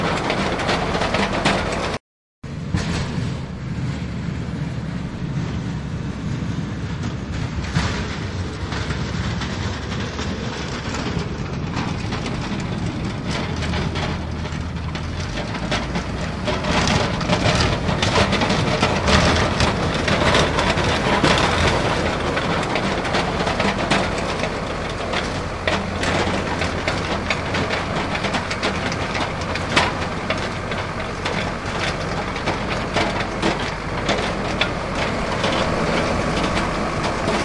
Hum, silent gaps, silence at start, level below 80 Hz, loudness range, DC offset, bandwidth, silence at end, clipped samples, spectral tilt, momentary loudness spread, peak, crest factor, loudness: none; 2.00-2.42 s; 0 s; -34 dBFS; 8 LU; under 0.1%; 11.5 kHz; 0 s; under 0.1%; -5 dB/octave; 9 LU; 0 dBFS; 22 dB; -22 LUFS